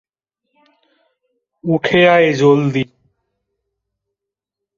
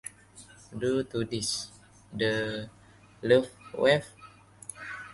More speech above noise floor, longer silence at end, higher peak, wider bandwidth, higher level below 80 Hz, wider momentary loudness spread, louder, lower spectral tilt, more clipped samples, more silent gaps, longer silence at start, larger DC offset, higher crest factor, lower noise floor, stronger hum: first, 70 dB vs 26 dB; first, 1.95 s vs 0 s; first, 0 dBFS vs -8 dBFS; second, 7.4 kHz vs 11.5 kHz; first, -56 dBFS vs -62 dBFS; second, 14 LU vs 20 LU; first, -13 LUFS vs -29 LUFS; first, -6.5 dB/octave vs -4 dB/octave; neither; neither; first, 1.65 s vs 0.05 s; neither; about the same, 18 dB vs 22 dB; first, -83 dBFS vs -53 dBFS; neither